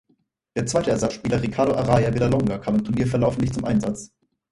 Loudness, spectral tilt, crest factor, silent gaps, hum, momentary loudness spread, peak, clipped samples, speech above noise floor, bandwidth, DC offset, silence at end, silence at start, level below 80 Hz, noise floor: -22 LUFS; -6.5 dB/octave; 18 dB; none; none; 6 LU; -4 dBFS; under 0.1%; 46 dB; 11.5 kHz; under 0.1%; 0.45 s; 0.55 s; -44 dBFS; -67 dBFS